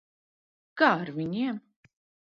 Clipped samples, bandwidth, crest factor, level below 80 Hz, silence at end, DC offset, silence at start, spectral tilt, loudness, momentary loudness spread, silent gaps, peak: under 0.1%; 7 kHz; 24 dB; -74 dBFS; 0.65 s; under 0.1%; 0.75 s; -7 dB/octave; -27 LUFS; 16 LU; none; -6 dBFS